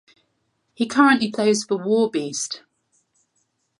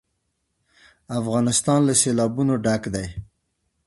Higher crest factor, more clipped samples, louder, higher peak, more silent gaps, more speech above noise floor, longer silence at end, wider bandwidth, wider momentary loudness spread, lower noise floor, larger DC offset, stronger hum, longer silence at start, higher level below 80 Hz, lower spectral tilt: about the same, 20 dB vs 18 dB; neither; about the same, -20 LUFS vs -21 LUFS; about the same, -2 dBFS vs -4 dBFS; neither; about the same, 51 dB vs 53 dB; first, 1.2 s vs 0.65 s; about the same, 11.5 kHz vs 12 kHz; about the same, 12 LU vs 13 LU; about the same, -71 dBFS vs -74 dBFS; neither; neither; second, 0.8 s vs 1.1 s; second, -70 dBFS vs -48 dBFS; about the same, -3.5 dB/octave vs -4.5 dB/octave